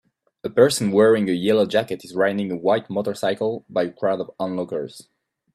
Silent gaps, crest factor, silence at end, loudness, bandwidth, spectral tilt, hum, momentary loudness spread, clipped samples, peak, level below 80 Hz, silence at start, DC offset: none; 20 dB; 0.55 s; -21 LUFS; 14 kHz; -5 dB/octave; none; 11 LU; under 0.1%; -2 dBFS; -66 dBFS; 0.45 s; under 0.1%